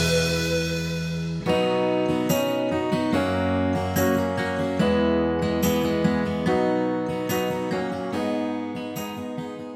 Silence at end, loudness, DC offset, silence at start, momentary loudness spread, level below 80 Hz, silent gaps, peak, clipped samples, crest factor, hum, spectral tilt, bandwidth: 0 s; -24 LUFS; under 0.1%; 0 s; 7 LU; -46 dBFS; none; -10 dBFS; under 0.1%; 14 dB; none; -5.5 dB/octave; 16 kHz